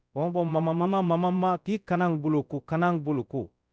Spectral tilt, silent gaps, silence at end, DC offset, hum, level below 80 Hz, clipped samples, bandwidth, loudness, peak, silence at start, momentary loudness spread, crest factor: -9 dB/octave; none; 0.25 s; under 0.1%; none; -64 dBFS; under 0.1%; 7 kHz; -27 LUFS; -12 dBFS; 0.15 s; 6 LU; 14 dB